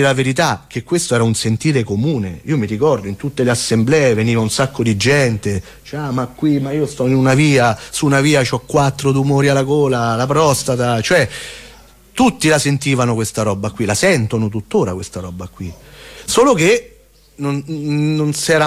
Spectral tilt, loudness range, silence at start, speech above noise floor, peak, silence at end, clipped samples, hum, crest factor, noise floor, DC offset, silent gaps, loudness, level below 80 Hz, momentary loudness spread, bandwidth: -5 dB/octave; 3 LU; 0 s; 27 dB; -2 dBFS; 0 s; under 0.1%; none; 12 dB; -43 dBFS; under 0.1%; none; -15 LUFS; -44 dBFS; 11 LU; 16 kHz